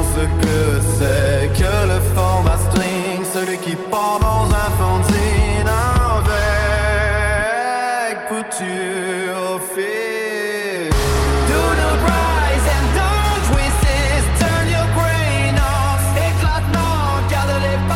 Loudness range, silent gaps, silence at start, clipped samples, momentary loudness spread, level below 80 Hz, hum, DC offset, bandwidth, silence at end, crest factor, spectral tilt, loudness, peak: 4 LU; none; 0 s; under 0.1%; 5 LU; -22 dBFS; none; under 0.1%; 17 kHz; 0 s; 14 dB; -5 dB/octave; -17 LUFS; -2 dBFS